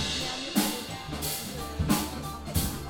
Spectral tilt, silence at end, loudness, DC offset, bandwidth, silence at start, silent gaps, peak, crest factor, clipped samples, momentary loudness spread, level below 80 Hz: -3.5 dB/octave; 0 s; -30 LUFS; under 0.1%; 17.5 kHz; 0 s; none; -12 dBFS; 20 dB; under 0.1%; 8 LU; -42 dBFS